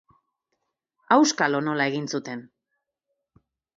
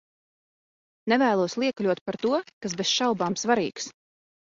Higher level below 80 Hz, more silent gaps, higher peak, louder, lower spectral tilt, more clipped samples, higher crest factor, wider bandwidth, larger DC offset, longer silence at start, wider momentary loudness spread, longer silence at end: second, -76 dBFS vs -70 dBFS; second, none vs 2.01-2.06 s, 2.53-2.61 s; first, -4 dBFS vs -8 dBFS; about the same, -23 LUFS vs -25 LUFS; about the same, -4 dB/octave vs -3.5 dB/octave; neither; about the same, 22 dB vs 20 dB; about the same, 7.8 kHz vs 7.8 kHz; neither; about the same, 1.1 s vs 1.05 s; first, 15 LU vs 11 LU; first, 1.35 s vs 0.5 s